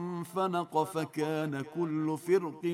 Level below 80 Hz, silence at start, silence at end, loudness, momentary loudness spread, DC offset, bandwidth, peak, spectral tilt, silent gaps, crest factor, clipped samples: -78 dBFS; 0 s; 0 s; -32 LUFS; 5 LU; under 0.1%; 16 kHz; -14 dBFS; -6.5 dB/octave; none; 16 dB; under 0.1%